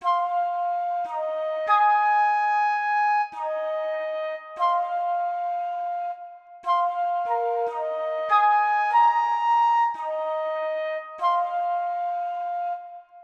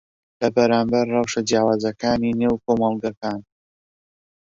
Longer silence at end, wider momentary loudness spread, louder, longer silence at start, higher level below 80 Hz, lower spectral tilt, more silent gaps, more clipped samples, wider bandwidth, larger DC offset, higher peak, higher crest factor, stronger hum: second, 0 s vs 1 s; about the same, 10 LU vs 9 LU; second, -24 LUFS vs -21 LUFS; second, 0 s vs 0.4 s; second, -78 dBFS vs -54 dBFS; second, -1 dB/octave vs -5.5 dB/octave; second, none vs 3.17-3.21 s; neither; about the same, 7.4 kHz vs 7.6 kHz; neither; second, -8 dBFS vs -4 dBFS; about the same, 16 dB vs 18 dB; neither